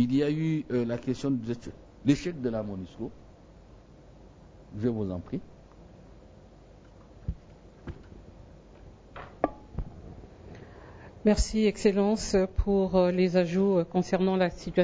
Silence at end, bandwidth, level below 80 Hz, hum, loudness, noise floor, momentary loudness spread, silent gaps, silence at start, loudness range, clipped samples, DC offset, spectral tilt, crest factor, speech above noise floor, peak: 0 s; 8 kHz; -44 dBFS; none; -28 LUFS; -52 dBFS; 23 LU; none; 0 s; 19 LU; under 0.1%; under 0.1%; -6.5 dB/octave; 22 dB; 26 dB; -8 dBFS